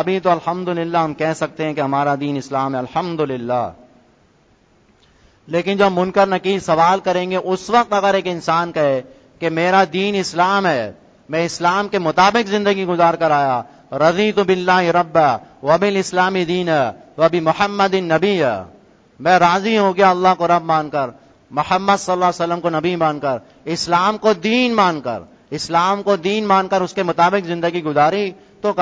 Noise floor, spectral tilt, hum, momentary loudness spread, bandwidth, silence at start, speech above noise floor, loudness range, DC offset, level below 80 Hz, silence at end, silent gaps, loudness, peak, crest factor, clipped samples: -55 dBFS; -5 dB/octave; none; 8 LU; 8 kHz; 0 s; 38 dB; 5 LU; under 0.1%; -56 dBFS; 0 s; none; -17 LUFS; 0 dBFS; 18 dB; under 0.1%